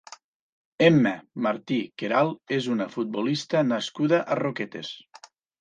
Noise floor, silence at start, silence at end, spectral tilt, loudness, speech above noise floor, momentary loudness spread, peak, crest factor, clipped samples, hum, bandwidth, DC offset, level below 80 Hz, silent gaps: -52 dBFS; 0.1 s; 0.45 s; -6 dB/octave; -25 LUFS; 28 dB; 11 LU; -4 dBFS; 22 dB; under 0.1%; none; 9.4 kHz; under 0.1%; -70 dBFS; 0.24-0.78 s